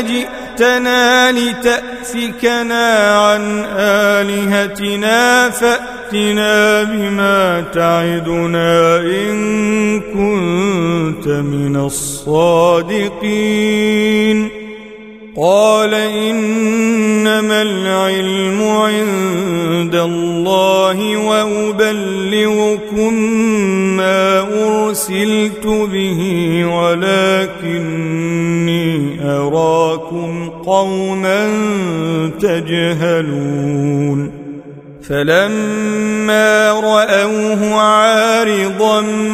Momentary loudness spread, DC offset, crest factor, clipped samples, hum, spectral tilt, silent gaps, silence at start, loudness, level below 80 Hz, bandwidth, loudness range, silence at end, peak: 7 LU; under 0.1%; 14 dB; under 0.1%; none; -4.5 dB/octave; none; 0 s; -13 LUFS; -46 dBFS; 16 kHz; 3 LU; 0 s; 0 dBFS